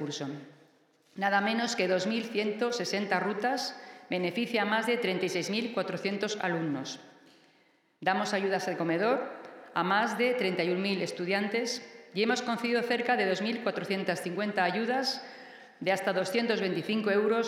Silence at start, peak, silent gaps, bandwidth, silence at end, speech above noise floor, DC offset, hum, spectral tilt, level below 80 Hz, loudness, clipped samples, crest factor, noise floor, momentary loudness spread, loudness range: 0 s; -12 dBFS; none; 15.5 kHz; 0 s; 37 dB; under 0.1%; none; -4.5 dB/octave; under -90 dBFS; -30 LUFS; under 0.1%; 20 dB; -67 dBFS; 9 LU; 3 LU